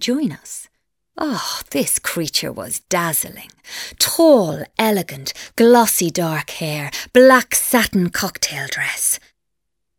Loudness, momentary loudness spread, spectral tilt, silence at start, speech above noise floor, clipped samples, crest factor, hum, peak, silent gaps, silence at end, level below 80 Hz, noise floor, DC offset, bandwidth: -17 LUFS; 15 LU; -3 dB/octave; 0 s; 62 dB; under 0.1%; 18 dB; none; 0 dBFS; none; 0.8 s; -52 dBFS; -79 dBFS; under 0.1%; over 20 kHz